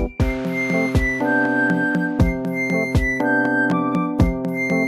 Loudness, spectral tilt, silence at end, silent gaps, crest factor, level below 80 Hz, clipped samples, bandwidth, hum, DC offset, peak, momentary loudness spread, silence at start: -20 LUFS; -7 dB/octave; 0 s; none; 16 dB; -30 dBFS; under 0.1%; 15 kHz; none; under 0.1%; -4 dBFS; 4 LU; 0 s